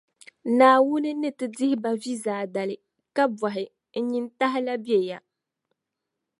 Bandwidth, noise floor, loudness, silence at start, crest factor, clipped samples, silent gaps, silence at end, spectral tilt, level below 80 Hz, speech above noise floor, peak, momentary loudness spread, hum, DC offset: 11.5 kHz; -84 dBFS; -25 LUFS; 0.45 s; 20 dB; under 0.1%; none; 1.2 s; -5 dB/octave; -80 dBFS; 60 dB; -4 dBFS; 15 LU; none; under 0.1%